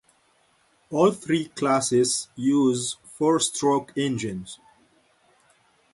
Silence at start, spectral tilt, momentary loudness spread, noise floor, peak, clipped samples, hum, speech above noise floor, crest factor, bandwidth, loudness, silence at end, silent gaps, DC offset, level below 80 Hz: 0.9 s; -4.5 dB/octave; 10 LU; -64 dBFS; -8 dBFS; under 0.1%; none; 41 dB; 18 dB; 11.5 kHz; -23 LUFS; 1.4 s; none; under 0.1%; -64 dBFS